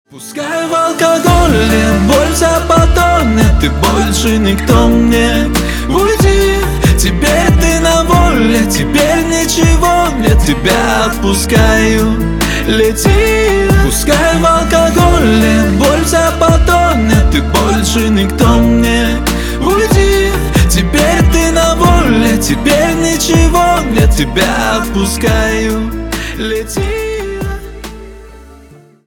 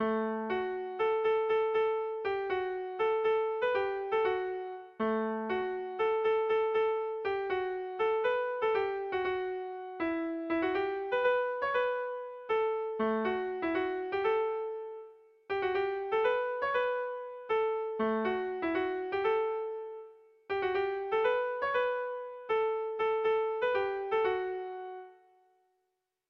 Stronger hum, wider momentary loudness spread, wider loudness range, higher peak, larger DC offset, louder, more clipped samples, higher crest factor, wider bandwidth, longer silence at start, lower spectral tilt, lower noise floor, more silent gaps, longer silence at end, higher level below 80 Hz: neither; about the same, 6 LU vs 8 LU; about the same, 3 LU vs 2 LU; first, 0 dBFS vs -18 dBFS; neither; first, -10 LUFS vs -32 LUFS; neither; about the same, 10 dB vs 14 dB; first, 19.5 kHz vs 5.8 kHz; first, 0.15 s vs 0 s; second, -5 dB/octave vs -6.5 dB/octave; second, -39 dBFS vs -83 dBFS; neither; second, 0.55 s vs 1.15 s; first, -16 dBFS vs -70 dBFS